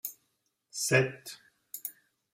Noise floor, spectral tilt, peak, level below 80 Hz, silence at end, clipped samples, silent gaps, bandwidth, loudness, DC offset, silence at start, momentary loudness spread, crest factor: -78 dBFS; -3.5 dB/octave; -10 dBFS; -72 dBFS; 0.4 s; under 0.1%; none; 16 kHz; -31 LUFS; under 0.1%; 0.05 s; 20 LU; 24 dB